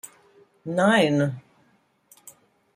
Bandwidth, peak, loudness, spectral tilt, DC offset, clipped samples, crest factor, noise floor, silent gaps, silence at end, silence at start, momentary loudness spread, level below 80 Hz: 15.5 kHz; -8 dBFS; -22 LUFS; -5.5 dB/octave; under 0.1%; under 0.1%; 18 dB; -64 dBFS; none; 0.45 s; 0.05 s; 22 LU; -68 dBFS